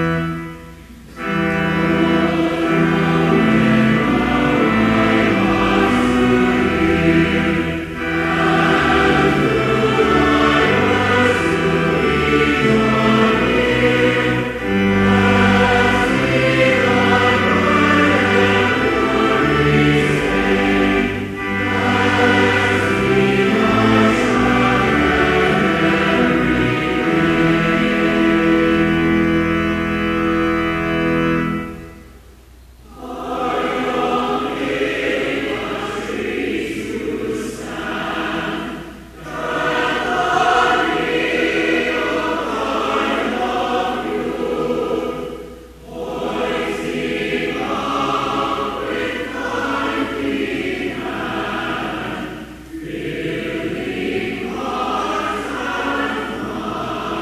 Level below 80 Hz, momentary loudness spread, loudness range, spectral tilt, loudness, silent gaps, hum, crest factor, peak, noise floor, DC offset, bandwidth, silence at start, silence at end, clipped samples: -36 dBFS; 10 LU; 8 LU; -6 dB/octave; -17 LUFS; none; none; 16 dB; 0 dBFS; -43 dBFS; under 0.1%; 14.5 kHz; 0 s; 0 s; under 0.1%